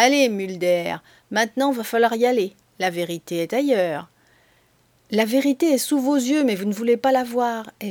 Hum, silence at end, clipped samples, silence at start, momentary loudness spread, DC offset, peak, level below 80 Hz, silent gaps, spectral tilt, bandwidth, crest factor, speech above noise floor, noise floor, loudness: none; 0 s; under 0.1%; 0 s; 8 LU; under 0.1%; -2 dBFS; -70 dBFS; none; -4 dB/octave; over 20 kHz; 20 dB; 40 dB; -60 dBFS; -21 LUFS